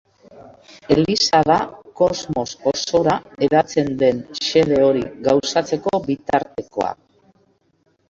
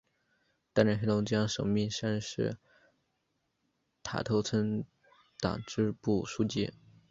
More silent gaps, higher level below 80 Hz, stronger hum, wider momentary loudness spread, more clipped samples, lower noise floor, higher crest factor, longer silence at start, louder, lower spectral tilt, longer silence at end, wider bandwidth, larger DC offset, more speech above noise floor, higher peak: neither; first, -50 dBFS vs -60 dBFS; neither; about the same, 9 LU vs 9 LU; neither; second, -63 dBFS vs -80 dBFS; about the same, 18 dB vs 22 dB; second, 0.4 s vs 0.75 s; first, -19 LUFS vs -32 LUFS; second, -4.5 dB/octave vs -6 dB/octave; first, 1.15 s vs 0.4 s; about the same, 7.8 kHz vs 7.8 kHz; neither; second, 45 dB vs 49 dB; first, -2 dBFS vs -10 dBFS